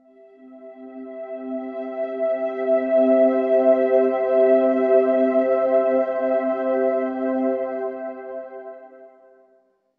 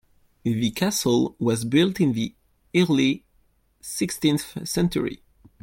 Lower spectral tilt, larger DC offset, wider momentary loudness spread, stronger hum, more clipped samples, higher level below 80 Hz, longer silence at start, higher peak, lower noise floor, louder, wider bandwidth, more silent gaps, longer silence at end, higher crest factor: first, -7.5 dB/octave vs -5 dB/octave; neither; first, 17 LU vs 11 LU; neither; neither; second, -72 dBFS vs -54 dBFS; about the same, 0.4 s vs 0.45 s; about the same, -6 dBFS vs -8 dBFS; about the same, -61 dBFS vs -63 dBFS; first, -20 LUFS vs -24 LUFS; second, 4.1 kHz vs 17 kHz; neither; first, 0.9 s vs 0.45 s; about the same, 16 dB vs 16 dB